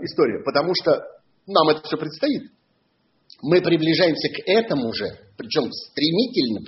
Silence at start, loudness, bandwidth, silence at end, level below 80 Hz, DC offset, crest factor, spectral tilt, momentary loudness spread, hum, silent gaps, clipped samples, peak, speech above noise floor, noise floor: 0 s; -21 LUFS; 6 kHz; 0 s; -62 dBFS; under 0.1%; 18 dB; -3.5 dB/octave; 10 LU; none; none; under 0.1%; -2 dBFS; 45 dB; -66 dBFS